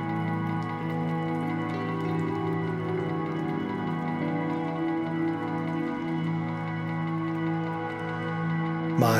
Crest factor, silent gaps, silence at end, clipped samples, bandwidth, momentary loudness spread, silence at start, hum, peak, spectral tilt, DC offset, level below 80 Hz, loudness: 20 dB; none; 0 s; under 0.1%; 14.5 kHz; 2 LU; 0 s; none; -10 dBFS; -7.5 dB/octave; under 0.1%; -62 dBFS; -30 LUFS